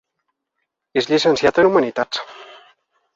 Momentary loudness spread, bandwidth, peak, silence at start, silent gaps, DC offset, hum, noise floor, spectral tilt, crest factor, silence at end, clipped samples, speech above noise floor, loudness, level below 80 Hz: 11 LU; 7.8 kHz; -2 dBFS; 0.95 s; none; under 0.1%; none; -76 dBFS; -4.5 dB/octave; 18 dB; 0.7 s; under 0.1%; 60 dB; -17 LUFS; -56 dBFS